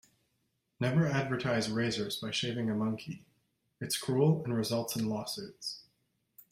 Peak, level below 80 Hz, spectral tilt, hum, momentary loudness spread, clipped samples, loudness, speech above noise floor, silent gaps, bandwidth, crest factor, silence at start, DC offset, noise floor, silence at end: -14 dBFS; -68 dBFS; -5 dB/octave; none; 12 LU; under 0.1%; -33 LUFS; 47 dB; none; 16 kHz; 20 dB; 0.8 s; under 0.1%; -79 dBFS; 0.7 s